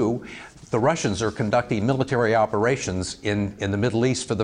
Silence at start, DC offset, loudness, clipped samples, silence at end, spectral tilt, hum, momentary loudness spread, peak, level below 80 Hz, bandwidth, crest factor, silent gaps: 0 s; under 0.1%; -23 LUFS; under 0.1%; 0 s; -5.5 dB/octave; none; 7 LU; -10 dBFS; -52 dBFS; 10.5 kHz; 14 dB; none